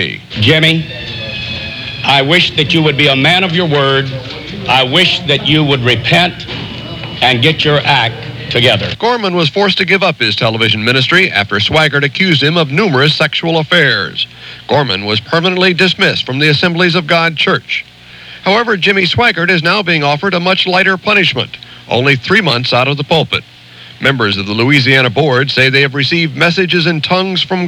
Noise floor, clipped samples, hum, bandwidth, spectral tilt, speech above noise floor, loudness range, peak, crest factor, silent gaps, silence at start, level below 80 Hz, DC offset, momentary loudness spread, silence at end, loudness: -33 dBFS; 0.3%; none; 15.5 kHz; -5 dB/octave; 22 dB; 2 LU; 0 dBFS; 12 dB; none; 0 s; -44 dBFS; under 0.1%; 10 LU; 0 s; -10 LUFS